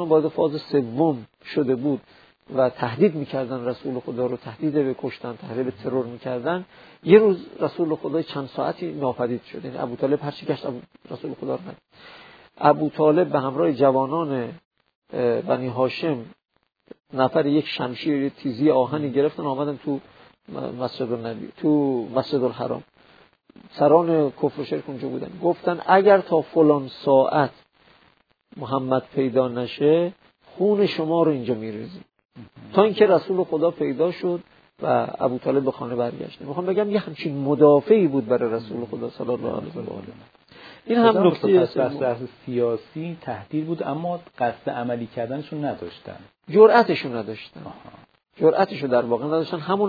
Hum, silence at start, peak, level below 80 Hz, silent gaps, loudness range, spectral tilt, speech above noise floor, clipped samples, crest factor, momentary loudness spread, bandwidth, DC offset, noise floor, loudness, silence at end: none; 0 s; 0 dBFS; -66 dBFS; 14.65-14.71 s, 14.95-15.02 s, 32.25-32.29 s; 6 LU; -9.5 dB/octave; 39 dB; under 0.1%; 22 dB; 14 LU; 5 kHz; under 0.1%; -61 dBFS; -22 LUFS; 0 s